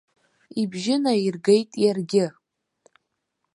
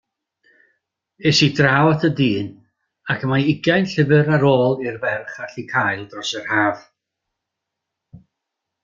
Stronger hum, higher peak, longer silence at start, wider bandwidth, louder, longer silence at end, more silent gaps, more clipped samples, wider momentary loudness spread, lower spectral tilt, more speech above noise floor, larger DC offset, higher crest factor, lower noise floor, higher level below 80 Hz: neither; second, -6 dBFS vs -2 dBFS; second, 0.55 s vs 1.2 s; first, 11.5 kHz vs 7.6 kHz; second, -23 LUFS vs -18 LUFS; first, 1.25 s vs 0.65 s; neither; neither; second, 9 LU vs 12 LU; about the same, -5.5 dB/octave vs -5.5 dB/octave; second, 56 dB vs 63 dB; neither; about the same, 18 dB vs 18 dB; about the same, -78 dBFS vs -81 dBFS; second, -72 dBFS vs -56 dBFS